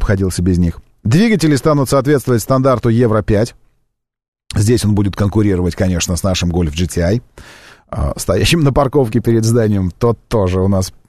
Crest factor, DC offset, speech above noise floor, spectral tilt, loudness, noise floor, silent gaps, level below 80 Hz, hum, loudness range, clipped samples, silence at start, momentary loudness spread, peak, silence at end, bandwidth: 12 dB; 0.9%; 53 dB; -6 dB/octave; -14 LUFS; -66 dBFS; 4.28-4.33 s; -30 dBFS; none; 3 LU; under 0.1%; 0 s; 5 LU; -2 dBFS; 0.1 s; 13.5 kHz